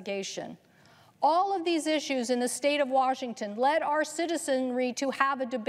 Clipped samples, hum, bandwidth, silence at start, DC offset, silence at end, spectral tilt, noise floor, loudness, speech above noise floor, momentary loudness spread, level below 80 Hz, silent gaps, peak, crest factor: under 0.1%; none; 15 kHz; 0 s; under 0.1%; 0 s; -2.5 dB/octave; -59 dBFS; -28 LUFS; 30 dB; 9 LU; -86 dBFS; none; -8 dBFS; 20 dB